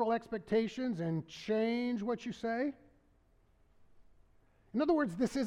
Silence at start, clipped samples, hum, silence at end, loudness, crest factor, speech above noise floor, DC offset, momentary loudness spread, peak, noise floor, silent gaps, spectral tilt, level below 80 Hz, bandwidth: 0 s; under 0.1%; none; 0 s; -35 LUFS; 16 dB; 34 dB; under 0.1%; 7 LU; -20 dBFS; -69 dBFS; none; -6.5 dB/octave; -66 dBFS; 11.5 kHz